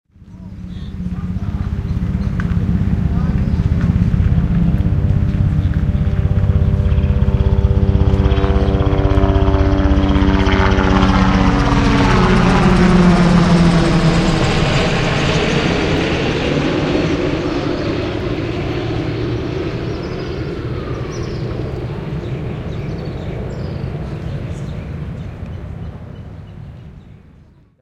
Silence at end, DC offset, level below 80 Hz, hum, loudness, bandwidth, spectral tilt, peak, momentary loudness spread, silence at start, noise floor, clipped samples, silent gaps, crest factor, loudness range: 0.7 s; under 0.1%; -22 dBFS; none; -16 LUFS; 10 kHz; -7 dB/octave; 0 dBFS; 14 LU; 0.2 s; -46 dBFS; under 0.1%; none; 16 dB; 13 LU